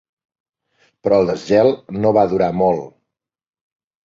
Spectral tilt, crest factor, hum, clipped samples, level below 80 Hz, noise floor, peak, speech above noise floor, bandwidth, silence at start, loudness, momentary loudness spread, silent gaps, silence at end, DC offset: -7.5 dB/octave; 18 dB; none; under 0.1%; -52 dBFS; -89 dBFS; -2 dBFS; 74 dB; 7.6 kHz; 1.05 s; -17 LUFS; 5 LU; none; 1.15 s; under 0.1%